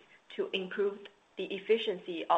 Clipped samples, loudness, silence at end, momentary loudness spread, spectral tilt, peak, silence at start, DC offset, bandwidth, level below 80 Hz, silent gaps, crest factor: under 0.1%; -34 LUFS; 0 s; 16 LU; -5.5 dB/octave; -14 dBFS; 0.3 s; under 0.1%; 8 kHz; -82 dBFS; none; 20 dB